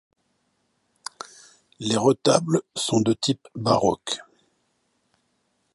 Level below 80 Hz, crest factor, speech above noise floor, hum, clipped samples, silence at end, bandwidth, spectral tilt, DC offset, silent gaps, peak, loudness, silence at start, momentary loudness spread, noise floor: -62 dBFS; 24 dB; 49 dB; none; under 0.1%; 1.55 s; 11.5 kHz; -5 dB/octave; under 0.1%; none; -2 dBFS; -23 LUFS; 1.8 s; 19 LU; -71 dBFS